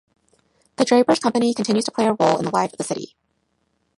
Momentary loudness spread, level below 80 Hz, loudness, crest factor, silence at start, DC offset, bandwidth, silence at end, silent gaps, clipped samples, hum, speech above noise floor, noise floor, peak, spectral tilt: 11 LU; -64 dBFS; -20 LUFS; 18 dB; 0.8 s; under 0.1%; 11.5 kHz; 0.95 s; none; under 0.1%; none; 50 dB; -69 dBFS; -4 dBFS; -4.5 dB/octave